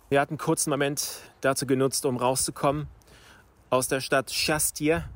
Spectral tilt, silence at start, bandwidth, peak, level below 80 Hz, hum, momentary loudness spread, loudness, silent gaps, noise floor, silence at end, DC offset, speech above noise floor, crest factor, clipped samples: -3.5 dB/octave; 0.1 s; 16.5 kHz; -10 dBFS; -52 dBFS; none; 5 LU; -26 LUFS; none; -54 dBFS; 0 s; under 0.1%; 28 dB; 16 dB; under 0.1%